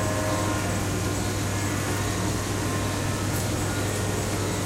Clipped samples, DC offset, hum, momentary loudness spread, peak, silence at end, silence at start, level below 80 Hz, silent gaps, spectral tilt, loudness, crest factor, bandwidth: under 0.1%; under 0.1%; none; 1 LU; -14 dBFS; 0 s; 0 s; -40 dBFS; none; -4.5 dB/octave; -26 LUFS; 14 dB; 16 kHz